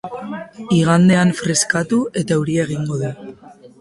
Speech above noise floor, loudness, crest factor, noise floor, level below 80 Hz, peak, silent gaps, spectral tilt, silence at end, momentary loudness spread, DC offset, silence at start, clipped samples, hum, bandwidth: 25 dB; -17 LUFS; 16 dB; -41 dBFS; -52 dBFS; -2 dBFS; none; -5 dB/octave; 0.15 s; 17 LU; under 0.1%; 0.05 s; under 0.1%; none; 11.5 kHz